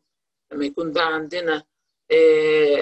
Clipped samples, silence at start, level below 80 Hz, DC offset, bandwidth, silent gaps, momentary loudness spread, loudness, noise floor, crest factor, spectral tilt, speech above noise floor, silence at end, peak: under 0.1%; 0.5 s; -66 dBFS; under 0.1%; 8.4 kHz; none; 12 LU; -20 LUFS; -81 dBFS; 14 dB; -5 dB/octave; 63 dB; 0 s; -6 dBFS